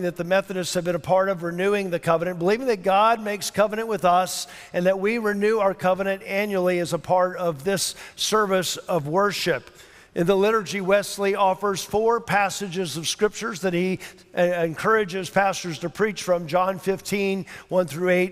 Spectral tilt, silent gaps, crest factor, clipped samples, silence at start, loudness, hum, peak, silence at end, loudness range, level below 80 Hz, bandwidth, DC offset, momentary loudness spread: -4.5 dB/octave; none; 18 dB; under 0.1%; 0 s; -23 LUFS; none; -6 dBFS; 0 s; 2 LU; -58 dBFS; 16 kHz; under 0.1%; 6 LU